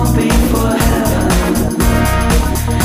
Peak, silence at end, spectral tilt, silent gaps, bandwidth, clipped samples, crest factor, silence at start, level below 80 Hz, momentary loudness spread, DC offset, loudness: 0 dBFS; 0 s; -5.5 dB/octave; none; 15.5 kHz; under 0.1%; 12 dB; 0 s; -18 dBFS; 2 LU; 2%; -13 LUFS